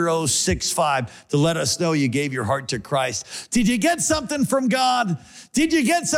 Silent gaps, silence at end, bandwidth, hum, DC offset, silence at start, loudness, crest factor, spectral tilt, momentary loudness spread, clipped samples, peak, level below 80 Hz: none; 0 s; 17 kHz; none; under 0.1%; 0 s; -21 LUFS; 12 dB; -4 dB/octave; 6 LU; under 0.1%; -10 dBFS; -46 dBFS